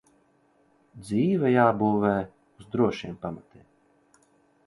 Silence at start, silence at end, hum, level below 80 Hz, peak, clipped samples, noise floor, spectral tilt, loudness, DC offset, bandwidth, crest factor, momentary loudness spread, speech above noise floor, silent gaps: 0.95 s; 1.25 s; none; -60 dBFS; -6 dBFS; under 0.1%; -65 dBFS; -8 dB/octave; -25 LUFS; under 0.1%; 11.5 kHz; 22 dB; 18 LU; 40 dB; none